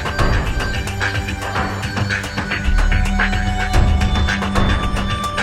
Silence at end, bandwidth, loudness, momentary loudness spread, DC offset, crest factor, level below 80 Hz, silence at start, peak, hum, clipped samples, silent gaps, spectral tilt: 0 s; 14.5 kHz; -19 LUFS; 4 LU; under 0.1%; 16 dB; -20 dBFS; 0 s; -2 dBFS; none; under 0.1%; none; -5 dB/octave